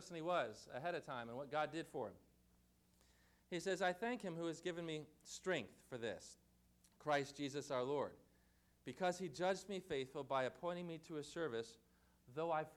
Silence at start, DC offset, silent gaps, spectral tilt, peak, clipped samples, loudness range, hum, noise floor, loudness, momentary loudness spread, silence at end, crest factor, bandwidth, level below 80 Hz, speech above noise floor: 0 s; under 0.1%; none; -4.5 dB/octave; -28 dBFS; under 0.1%; 2 LU; 60 Hz at -75 dBFS; -75 dBFS; -45 LUFS; 9 LU; 0 s; 18 dB; 17.5 kHz; -78 dBFS; 30 dB